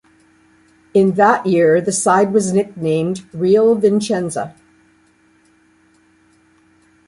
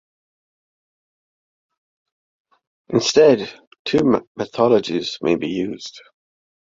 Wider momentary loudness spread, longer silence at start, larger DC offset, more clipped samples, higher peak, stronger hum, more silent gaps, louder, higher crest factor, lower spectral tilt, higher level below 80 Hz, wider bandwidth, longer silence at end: second, 8 LU vs 17 LU; second, 0.95 s vs 2.9 s; neither; neither; about the same, -2 dBFS vs -2 dBFS; neither; second, none vs 3.67-3.71 s, 3.79-3.85 s, 4.27-4.35 s; first, -15 LUFS vs -18 LUFS; about the same, 16 dB vs 20 dB; about the same, -5.5 dB/octave vs -5 dB/octave; about the same, -58 dBFS vs -58 dBFS; first, 11.5 kHz vs 7.6 kHz; first, 2.55 s vs 0.7 s